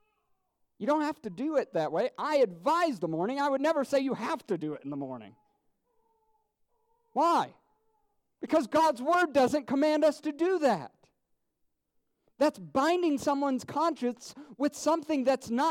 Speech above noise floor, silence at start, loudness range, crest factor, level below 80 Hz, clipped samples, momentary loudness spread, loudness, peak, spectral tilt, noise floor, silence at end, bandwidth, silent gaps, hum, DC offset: 49 dB; 0.8 s; 7 LU; 16 dB; -74 dBFS; under 0.1%; 11 LU; -29 LUFS; -14 dBFS; -5 dB/octave; -78 dBFS; 0 s; 16.5 kHz; none; none; under 0.1%